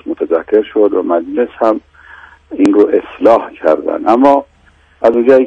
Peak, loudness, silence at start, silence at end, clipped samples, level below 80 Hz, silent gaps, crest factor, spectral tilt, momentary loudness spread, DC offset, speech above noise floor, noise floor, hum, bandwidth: 0 dBFS; -12 LUFS; 0.05 s; 0 s; 0.5%; -50 dBFS; none; 12 dB; -6.5 dB/octave; 7 LU; under 0.1%; 37 dB; -47 dBFS; none; 9.4 kHz